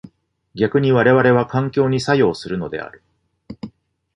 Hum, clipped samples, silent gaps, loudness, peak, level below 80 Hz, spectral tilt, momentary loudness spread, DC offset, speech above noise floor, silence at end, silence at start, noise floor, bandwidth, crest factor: none; under 0.1%; none; -17 LUFS; -2 dBFS; -52 dBFS; -7 dB/octave; 22 LU; under 0.1%; 35 dB; 0.45 s; 0.55 s; -52 dBFS; 10.5 kHz; 16 dB